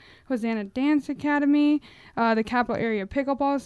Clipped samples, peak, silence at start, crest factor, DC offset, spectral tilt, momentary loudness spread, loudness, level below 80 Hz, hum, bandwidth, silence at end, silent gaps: under 0.1%; -10 dBFS; 0.3 s; 14 dB; under 0.1%; -6.5 dB/octave; 7 LU; -25 LUFS; -56 dBFS; none; 11 kHz; 0 s; none